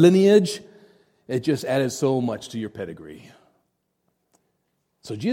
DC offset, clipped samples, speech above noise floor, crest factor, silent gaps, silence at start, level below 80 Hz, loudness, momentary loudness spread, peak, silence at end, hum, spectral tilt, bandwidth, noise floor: under 0.1%; under 0.1%; 52 dB; 20 dB; none; 0 s; -66 dBFS; -22 LUFS; 19 LU; -4 dBFS; 0 s; none; -6 dB/octave; 16 kHz; -73 dBFS